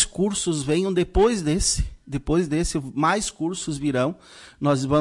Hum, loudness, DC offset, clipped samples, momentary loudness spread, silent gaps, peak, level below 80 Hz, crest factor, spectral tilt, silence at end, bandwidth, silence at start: none; -23 LUFS; under 0.1%; under 0.1%; 7 LU; none; -8 dBFS; -36 dBFS; 16 dB; -4.5 dB/octave; 0 s; 11.5 kHz; 0 s